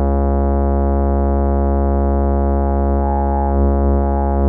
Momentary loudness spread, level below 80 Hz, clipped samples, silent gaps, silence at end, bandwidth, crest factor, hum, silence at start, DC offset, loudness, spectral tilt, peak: 1 LU; -16 dBFS; under 0.1%; none; 0 s; 2.2 kHz; 10 dB; none; 0 s; under 0.1%; -17 LUFS; -15 dB/octave; -4 dBFS